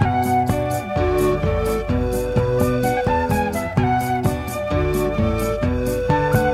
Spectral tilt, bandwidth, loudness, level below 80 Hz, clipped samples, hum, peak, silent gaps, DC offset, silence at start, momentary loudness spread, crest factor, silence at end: -7 dB/octave; 16 kHz; -20 LUFS; -30 dBFS; under 0.1%; none; -4 dBFS; none; under 0.1%; 0 s; 3 LU; 16 dB; 0 s